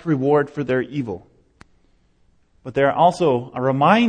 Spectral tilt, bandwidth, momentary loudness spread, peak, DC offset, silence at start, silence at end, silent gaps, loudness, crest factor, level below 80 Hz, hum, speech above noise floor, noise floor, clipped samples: -7 dB/octave; 10 kHz; 13 LU; -2 dBFS; under 0.1%; 0.05 s; 0 s; none; -20 LUFS; 18 dB; -56 dBFS; none; 40 dB; -59 dBFS; under 0.1%